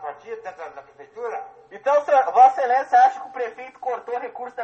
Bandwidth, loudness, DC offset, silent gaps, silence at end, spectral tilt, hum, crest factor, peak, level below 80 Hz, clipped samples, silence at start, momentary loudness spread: 7.6 kHz; -20 LUFS; under 0.1%; none; 0 s; -2.5 dB/octave; none; 18 dB; -4 dBFS; -74 dBFS; under 0.1%; 0 s; 20 LU